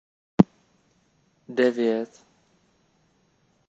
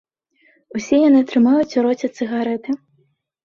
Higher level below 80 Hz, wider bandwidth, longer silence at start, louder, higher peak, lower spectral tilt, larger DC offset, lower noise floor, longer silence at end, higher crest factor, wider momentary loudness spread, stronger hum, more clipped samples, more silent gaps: about the same, -60 dBFS vs -62 dBFS; first, 8 kHz vs 7.2 kHz; second, 0.4 s vs 0.75 s; second, -24 LUFS vs -17 LUFS; about the same, -2 dBFS vs -4 dBFS; first, -8 dB/octave vs -5.5 dB/octave; neither; about the same, -66 dBFS vs -63 dBFS; first, 1.65 s vs 0.7 s; first, 26 dB vs 14 dB; about the same, 12 LU vs 14 LU; neither; neither; neither